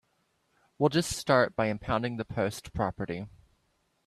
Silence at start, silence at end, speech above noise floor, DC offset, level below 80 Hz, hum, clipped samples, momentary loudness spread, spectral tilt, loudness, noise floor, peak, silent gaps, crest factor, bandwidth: 0.8 s; 0.8 s; 45 dB; under 0.1%; -54 dBFS; none; under 0.1%; 12 LU; -5 dB/octave; -29 LUFS; -73 dBFS; -10 dBFS; none; 22 dB; 14.5 kHz